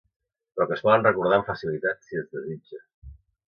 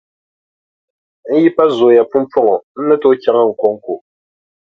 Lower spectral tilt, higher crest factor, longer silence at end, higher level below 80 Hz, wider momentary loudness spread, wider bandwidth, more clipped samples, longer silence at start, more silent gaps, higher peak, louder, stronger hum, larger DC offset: about the same, -7.5 dB/octave vs -7.5 dB/octave; first, 22 dB vs 14 dB; second, 0.45 s vs 0.7 s; first, -56 dBFS vs -62 dBFS; first, 19 LU vs 8 LU; about the same, 6.6 kHz vs 6.6 kHz; neither; second, 0.55 s vs 1.25 s; about the same, 2.94-3.02 s vs 2.63-2.75 s; second, -4 dBFS vs 0 dBFS; second, -24 LUFS vs -13 LUFS; neither; neither